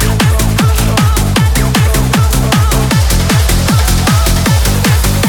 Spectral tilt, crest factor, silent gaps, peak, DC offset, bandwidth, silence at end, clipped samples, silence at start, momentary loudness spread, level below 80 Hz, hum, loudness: -4.5 dB/octave; 10 dB; none; 0 dBFS; under 0.1%; 19 kHz; 0 s; under 0.1%; 0 s; 1 LU; -14 dBFS; none; -10 LUFS